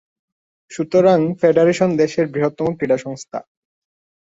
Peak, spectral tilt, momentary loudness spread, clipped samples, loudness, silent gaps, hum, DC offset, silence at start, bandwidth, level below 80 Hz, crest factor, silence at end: -2 dBFS; -6.5 dB/octave; 16 LU; under 0.1%; -17 LUFS; none; none; under 0.1%; 0.7 s; 8 kHz; -60 dBFS; 16 dB; 0.8 s